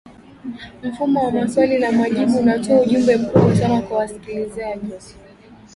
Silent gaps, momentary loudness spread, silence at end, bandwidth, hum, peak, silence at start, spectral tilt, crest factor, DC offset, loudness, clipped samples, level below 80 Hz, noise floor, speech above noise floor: none; 17 LU; 0.65 s; 11.5 kHz; none; 0 dBFS; 0.45 s; -7 dB/octave; 18 dB; under 0.1%; -18 LUFS; under 0.1%; -48 dBFS; -44 dBFS; 27 dB